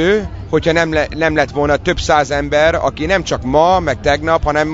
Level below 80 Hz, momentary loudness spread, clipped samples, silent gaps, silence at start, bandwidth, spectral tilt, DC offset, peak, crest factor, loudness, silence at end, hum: -30 dBFS; 4 LU; under 0.1%; none; 0 s; 7.8 kHz; -5 dB/octave; under 0.1%; 0 dBFS; 14 dB; -14 LUFS; 0 s; none